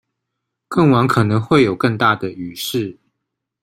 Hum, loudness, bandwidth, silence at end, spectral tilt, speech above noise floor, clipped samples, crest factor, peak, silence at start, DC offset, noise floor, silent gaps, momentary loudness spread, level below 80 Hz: none; -16 LUFS; 16 kHz; 0.7 s; -6.5 dB/octave; 62 dB; under 0.1%; 16 dB; -2 dBFS; 0.7 s; under 0.1%; -78 dBFS; none; 11 LU; -52 dBFS